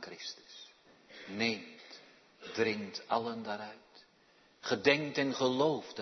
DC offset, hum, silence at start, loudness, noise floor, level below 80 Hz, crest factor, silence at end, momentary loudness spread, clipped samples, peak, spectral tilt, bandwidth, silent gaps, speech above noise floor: under 0.1%; none; 0 s; -34 LUFS; -66 dBFS; -82 dBFS; 26 dB; 0 s; 23 LU; under 0.1%; -10 dBFS; -2.5 dB/octave; 6.2 kHz; none; 33 dB